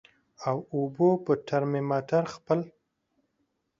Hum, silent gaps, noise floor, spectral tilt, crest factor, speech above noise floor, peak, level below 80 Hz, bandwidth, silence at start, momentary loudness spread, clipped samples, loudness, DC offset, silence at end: none; none; -77 dBFS; -8 dB/octave; 18 dB; 50 dB; -10 dBFS; -70 dBFS; 7.6 kHz; 0.4 s; 7 LU; under 0.1%; -28 LUFS; under 0.1%; 1.1 s